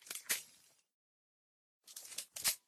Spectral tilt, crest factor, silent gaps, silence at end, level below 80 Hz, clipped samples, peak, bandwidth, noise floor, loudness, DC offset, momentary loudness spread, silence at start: 2 dB/octave; 26 dB; 0.94-1.81 s; 0.1 s; -80 dBFS; under 0.1%; -20 dBFS; 18 kHz; -68 dBFS; -40 LUFS; under 0.1%; 17 LU; 0 s